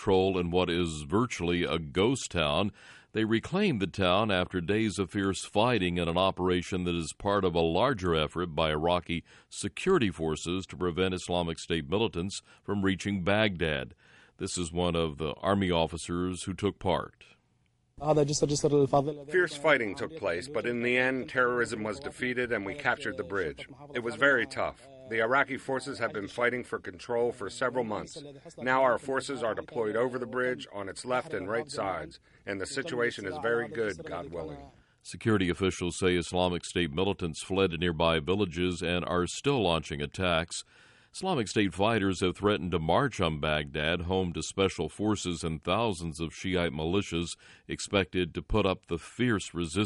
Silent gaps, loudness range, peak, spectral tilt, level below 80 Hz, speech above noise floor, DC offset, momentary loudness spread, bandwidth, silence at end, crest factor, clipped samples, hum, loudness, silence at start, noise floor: none; 4 LU; -10 dBFS; -5 dB/octave; -52 dBFS; 41 dB; under 0.1%; 10 LU; 11.5 kHz; 0 s; 20 dB; under 0.1%; none; -30 LUFS; 0 s; -71 dBFS